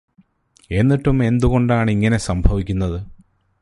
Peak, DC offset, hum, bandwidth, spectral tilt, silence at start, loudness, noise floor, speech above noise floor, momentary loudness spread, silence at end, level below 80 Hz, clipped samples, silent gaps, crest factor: -4 dBFS; under 0.1%; none; 11.5 kHz; -7.5 dB/octave; 0.7 s; -18 LUFS; -56 dBFS; 40 dB; 8 LU; 0.5 s; -28 dBFS; under 0.1%; none; 16 dB